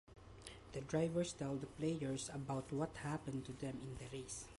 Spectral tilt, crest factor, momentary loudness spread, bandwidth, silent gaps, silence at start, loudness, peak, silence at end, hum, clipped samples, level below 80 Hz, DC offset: -5.5 dB/octave; 16 dB; 11 LU; 11.5 kHz; none; 0.1 s; -44 LUFS; -28 dBFS; 0.05 s; none; under 0.1%; -64 dBFS; under 0.1%